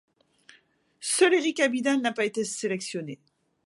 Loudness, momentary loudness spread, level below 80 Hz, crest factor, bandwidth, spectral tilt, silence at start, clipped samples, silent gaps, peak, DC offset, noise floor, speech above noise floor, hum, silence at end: -26 LUFS; 15 LU; -80 dBFS; 20 dB; 11.5 kHz; -3 dB/octave; 1 s; under 0.1%; none; -8 dBFS; under 0.1%; -62 dBFS; 37 dB; none; 0.5 s